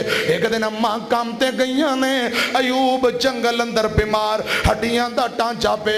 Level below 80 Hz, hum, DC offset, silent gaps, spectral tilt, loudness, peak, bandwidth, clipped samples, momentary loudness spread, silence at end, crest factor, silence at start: -38 dBFS; none; under 0.1%; none; -4 dB/octave; -19 LUFS; -6 dBFS; 15.5 kHz; under 0.1%; 3 LU; 0 s; 12 dB; 0 s